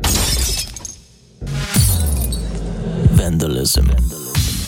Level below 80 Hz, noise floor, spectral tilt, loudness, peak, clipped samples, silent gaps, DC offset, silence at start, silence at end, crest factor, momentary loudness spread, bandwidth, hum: -22 dBFS; -43 dBFS; -4 dB/octave; -17 LUFS; 0 dBFS; under 0.1%; none; under 0.1%; 0 s; 0 s; 16 dB; 12 LU; 19 kHz; none